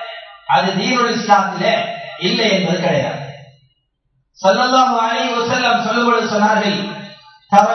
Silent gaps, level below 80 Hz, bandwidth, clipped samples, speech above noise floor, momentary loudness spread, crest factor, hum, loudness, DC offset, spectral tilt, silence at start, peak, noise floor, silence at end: none; -64 dBFS; 7.8 kHz; under 0.1%; 51 dB; 13 LU; 16 dB; none; -15 LUFS; under 0.1%; -4.5 dB/octave; 0 s; 0 dBFS; -66 dBFS; 0 s